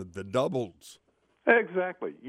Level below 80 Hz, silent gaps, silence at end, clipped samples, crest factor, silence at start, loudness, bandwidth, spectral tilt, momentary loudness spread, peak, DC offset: -70 dBFS; none; 0 s; under 0.1%; 22 dB; 0 s; -28 LUFS; 13.5 kHz; -6 dB/octave; 10 LU; -8 dBFS; under 0.1%